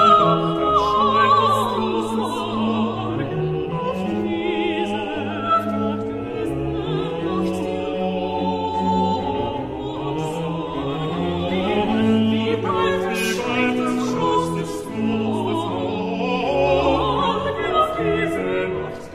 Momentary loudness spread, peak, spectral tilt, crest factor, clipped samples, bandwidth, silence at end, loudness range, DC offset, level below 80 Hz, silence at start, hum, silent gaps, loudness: 8 LU; -2 dBFS; -6 dB/octave; 18 dB; under 0.1%; 15 kHz; 0 s; 4 LU; under 0.1%; -44 dBFS; 0 s; none; none; -21 LUFS